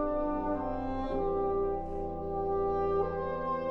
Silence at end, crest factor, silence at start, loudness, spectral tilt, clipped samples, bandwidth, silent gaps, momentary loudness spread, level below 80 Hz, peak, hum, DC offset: 0 s; 12 dB; 0 s; -33 LUFS; -9.5 dB/octave; under 0.1%; 5.6 kHz; none; 5 LU; -44 dBFS; -18 dBFS; none; under 0.1%